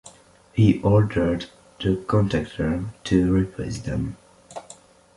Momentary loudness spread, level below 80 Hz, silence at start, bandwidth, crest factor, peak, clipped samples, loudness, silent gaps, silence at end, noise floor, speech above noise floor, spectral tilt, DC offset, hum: 19 LU; -40 dBFS; 0.05 s; 11.5 kHz; 20 dB; -4 dBFS; under 0.1%; -23 LUFS; none; 0.45 s; -51 dBFS; 30 dB; -7.5 dB/octave; under 0.1%; none